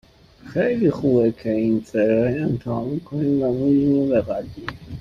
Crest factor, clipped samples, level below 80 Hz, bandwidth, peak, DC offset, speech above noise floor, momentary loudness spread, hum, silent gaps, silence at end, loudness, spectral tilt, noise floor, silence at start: 14 dB; under 0.1%; -50 dBFS; 7.4 kHz; -6 dBFS; under 0.1%; 24 dB; 10 LU; none; none; 0 s; -21 LUFS; -9 dB/octave; -44 dBFS; 0.45 s